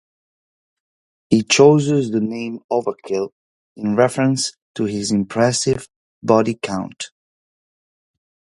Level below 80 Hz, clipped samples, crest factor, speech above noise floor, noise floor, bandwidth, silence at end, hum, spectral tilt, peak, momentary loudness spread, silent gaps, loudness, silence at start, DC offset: -56 dBFS; under 0.1%; 20 dB; over 73 dB; under -90 dBFS; 11.5 kHz; 1.5 s; none; -5 dB/octave; 0 dBFS; 15 LU; 2.64-2.69 s, 3.32-3.76 s, 4.62-4.75 s, 5.96-6.22 s; -18 LUFS; 1.3 s; under 0.1%